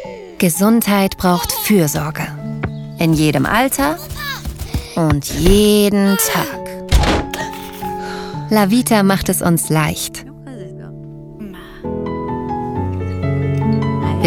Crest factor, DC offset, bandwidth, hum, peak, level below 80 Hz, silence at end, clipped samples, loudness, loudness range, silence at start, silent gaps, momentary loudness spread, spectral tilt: 16 dB; under 0.1%; 19 kHz; none; 0 dBFS; -28 dBFS; 0 s; under 0.1%; -16 LUFS; 7 LU; 0 s; none; 19 LU; -5 dB/octave